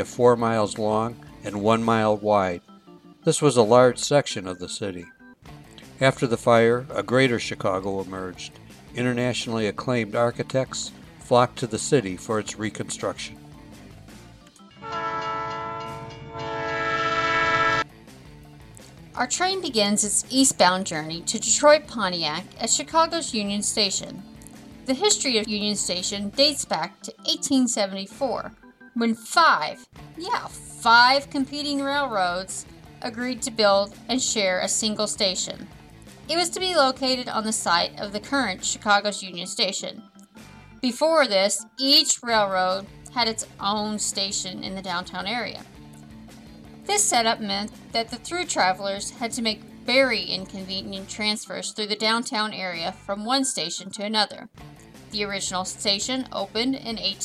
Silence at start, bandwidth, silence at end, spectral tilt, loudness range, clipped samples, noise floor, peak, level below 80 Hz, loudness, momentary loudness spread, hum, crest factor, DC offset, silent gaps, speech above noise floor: 0 s; 15.5 kHz; 0 s; -3 dB/octave; 5 LU; under 0.1%; -49 dBFS; -4 dBFS; -56 dBFS; -23 LUFS; 13 LU; none; 22 dB; under 0.1%; none; 25 dB